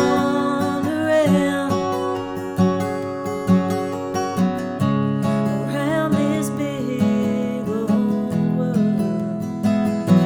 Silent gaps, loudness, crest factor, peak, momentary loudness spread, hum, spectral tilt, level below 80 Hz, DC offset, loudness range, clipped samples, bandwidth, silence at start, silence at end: none; -21 LUFS; 16 dB; -4 dBFS; 6 LU; none; -7 dB/octave; -54 dBFS; under 0.1%; 1 LU; under 0.1%; 17.5 kHz; 0 s; 0 s